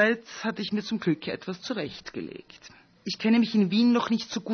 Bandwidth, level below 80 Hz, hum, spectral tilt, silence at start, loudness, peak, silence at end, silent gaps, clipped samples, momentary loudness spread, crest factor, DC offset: 6.6 kHz; -68 dBFS; none; -5.5 dB/octave; 0 s; -27 LUFS; -10 dBFS; 0 s; none; under 0.1%; 15 LU; 16 dB; under 0.1%